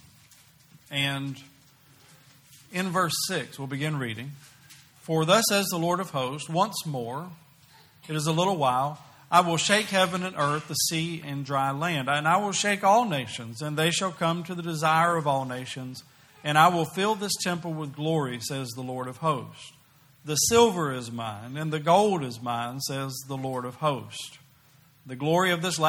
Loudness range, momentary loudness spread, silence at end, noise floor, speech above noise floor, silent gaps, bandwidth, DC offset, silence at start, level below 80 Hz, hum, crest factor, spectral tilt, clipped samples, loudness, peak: 6 LU; 14 LU; 0 s; -58 dBFS; 32 dB; none; 18.5 kHz; under 0.1%; 0.9 s; -66 dBFS; none; 22 dB; -4 dB/octave; under 0.1%; -26 LUFS; -4 dBFS